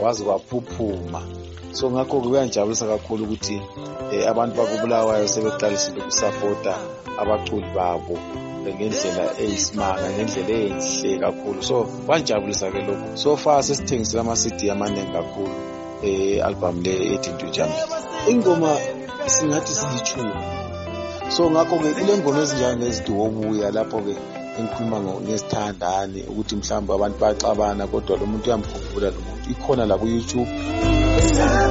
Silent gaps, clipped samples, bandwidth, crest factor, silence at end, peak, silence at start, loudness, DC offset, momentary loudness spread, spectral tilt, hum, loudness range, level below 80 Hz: none; under 0.1%; 8 kHz; 18 dB; 0 s; -4 dBFS; 0 s; -22 LUFS; under 0.1%; 11 LU; -4.5 dB/octave; none; 3 LU; -36 dBFS